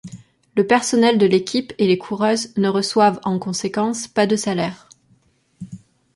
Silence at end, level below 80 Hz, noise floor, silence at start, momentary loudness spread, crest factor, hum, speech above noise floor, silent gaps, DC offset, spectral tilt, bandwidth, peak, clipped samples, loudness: 0.4 s; -60 dBFS; -59 dBFS; 0.05 s; 13 LU; 18 dB; none; 41 dB; none; under 0.1%; -4.5 dB/octave; 11.5 kHz; -2 dBFS; under 0.1%; -19 LUFS